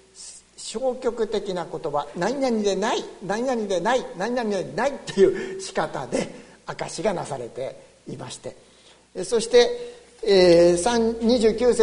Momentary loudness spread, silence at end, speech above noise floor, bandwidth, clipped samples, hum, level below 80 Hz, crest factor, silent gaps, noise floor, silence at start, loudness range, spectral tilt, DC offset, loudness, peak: 19 LU; 0 s; 31 dB; 11 kHz; under 0.1%; none; -50 dBFS; 20 dB; none; -53 dBFS; 0.15 s; 10 LU; -4.5 dB/octave; under 0.1%; -23 LUFS; -4 dBFS